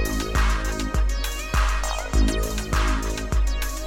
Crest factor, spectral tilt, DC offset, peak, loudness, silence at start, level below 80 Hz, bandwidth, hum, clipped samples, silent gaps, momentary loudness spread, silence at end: 14 dB; -4.5 dB/octave; under 0.1%; -10 dBFS; -25 LUFS; 0 s; -24 dBFS; 16.5 kHz; none; under 0.1%; none; 3 LU; 0 s